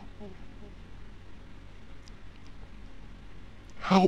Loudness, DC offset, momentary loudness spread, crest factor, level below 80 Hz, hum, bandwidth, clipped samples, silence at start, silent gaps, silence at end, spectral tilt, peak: -39 LUFS; 0.5%; 6 LU; 24 dB; -50 dBFS; none; 8.4 kHz; under 0.1%; 0 s; none; 0 s; -7 dB/octave; -10 dBFS